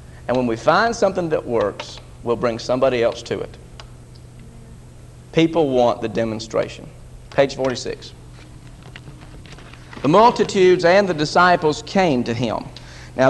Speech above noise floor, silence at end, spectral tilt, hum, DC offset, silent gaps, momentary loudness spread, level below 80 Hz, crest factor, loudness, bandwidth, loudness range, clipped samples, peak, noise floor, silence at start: 23 dB; 0 s; -5.5 dB/octave; none; under 0.1%; none; 24 LU; -44 dBFS; 18 dB; -18 LUFS; 12 kHz; 9 LU; under 0.1%; 0 dBFS; -41 dBFS; 0 s